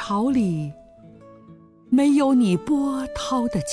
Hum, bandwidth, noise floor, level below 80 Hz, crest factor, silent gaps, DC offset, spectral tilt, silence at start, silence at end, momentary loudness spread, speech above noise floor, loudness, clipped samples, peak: none; 11 kHz; -48 dBFS; -50 dBFS; 12 dB; none; under 0.1%; -6 dB/octave; 0 s; 0 s; 9 LU; 28 dB; -21 LUFS; under 0.1%; -10 dBFS